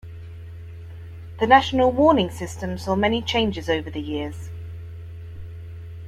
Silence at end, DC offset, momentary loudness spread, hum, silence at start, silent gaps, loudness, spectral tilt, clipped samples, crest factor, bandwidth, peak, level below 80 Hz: 0 s; under 0.1%; 23 LU; none; 0.05 s; none; -21 LUFS; -5.5 dB/octave; under 0.1%; 22 dB; 14.5 kHz; -2 dBFS; -46 dBFS